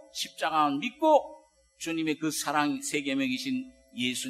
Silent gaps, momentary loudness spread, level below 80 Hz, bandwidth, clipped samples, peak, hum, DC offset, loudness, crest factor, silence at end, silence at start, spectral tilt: none; 12 LU; -70 dBFS; 13.5 kHz; under 0.1%; -10 dBFS; none; under 0.1%; -28 LUFS; 20 dB; 0 s; 0.15 s; -3 dB/octave